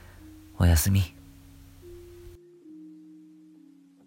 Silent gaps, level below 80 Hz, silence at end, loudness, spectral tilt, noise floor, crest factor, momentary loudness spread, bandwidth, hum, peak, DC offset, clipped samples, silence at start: none; -38 dBFS; 1.75 s; -24 LUFS; -5 dB/octave; -55 dBFS; 20 dB; 27 LU; 16.5 kHz; none; -10 dBFS; under 0.1%; under 0.1%; 0.6 s